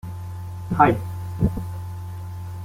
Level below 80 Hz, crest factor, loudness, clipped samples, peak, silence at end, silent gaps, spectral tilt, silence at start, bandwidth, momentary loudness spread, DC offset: -40 dBFS; 22 dB; -25 LUFS; under 0.1%; -2 dBFS; 0 s; none; -8 dB/octave; 0.05 s; 16 kHz; 16 LU; under 0.1%